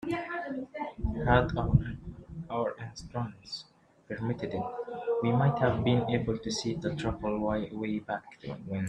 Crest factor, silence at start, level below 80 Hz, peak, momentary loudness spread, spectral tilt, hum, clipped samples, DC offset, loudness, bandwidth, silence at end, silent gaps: 22 dB; 0 s; -46 dBFS; -8 dBFS; 15 LU; -6.5 dB/octave; none; under 0.1%; under 0.1%; -31 LUFS; 9.6 kHz; 0 s; none